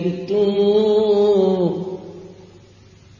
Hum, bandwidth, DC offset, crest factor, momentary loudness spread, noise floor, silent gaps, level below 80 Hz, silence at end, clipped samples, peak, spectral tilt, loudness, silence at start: none; 7.2 kHz; under 0.1%; 12 dB; 15 LU; -47 dBFS; none; -56 dBFS; 0.85 s; under 0.1%; -6 dBFS; -8 dB/octave; -17 LUFS; 0 s